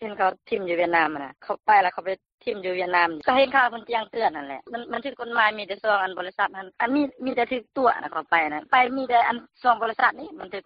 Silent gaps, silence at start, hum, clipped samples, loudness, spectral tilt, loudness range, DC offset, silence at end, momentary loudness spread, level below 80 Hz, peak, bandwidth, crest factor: 2.34-2.38 s; 0 s; none; under 0.1%; -24 LUFS; -0.5 dB/octave; 3 LU; under 0.1%; 0.05 s; 12 LU; -66 dBFS; -6 dBFS; 5.4 kHz; 18 dB